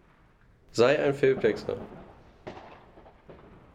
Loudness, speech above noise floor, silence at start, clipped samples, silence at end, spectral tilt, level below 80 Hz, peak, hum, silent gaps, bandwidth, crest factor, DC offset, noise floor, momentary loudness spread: -26 LUFS; 35 dB; 0.75 s; under 0.1%; 0.4 s; -5.5 dB/octave; -58 dBFS; -8 dBFS; none; none; 10.5 kHz; 20 dB; under 0.1%; -59 dBFS; 24 LU